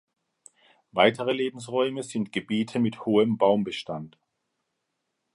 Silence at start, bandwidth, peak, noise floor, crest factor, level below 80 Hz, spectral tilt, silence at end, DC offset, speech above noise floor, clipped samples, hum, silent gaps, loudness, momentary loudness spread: 0.95 s; 11.5 kHz; -4 dBFS; -80 dBFS; 22 dB; -70 dBFS; -5.5 dB/octave; 1.25 s; under 0.1%; 55 dB; under 0.1%; none; none; -26 LUFS; 12 LU